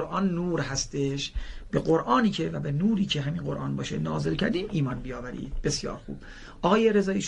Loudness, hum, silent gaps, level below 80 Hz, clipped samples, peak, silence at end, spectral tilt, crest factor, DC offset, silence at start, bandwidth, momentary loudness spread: -27 LUFS; none; none; -42 dBFS; under 0.1%; -8 dBFS; 0 s; -5.5 dB/octave; 18 dB; under 0.1%; 0 s; 11 kHz; 13 LU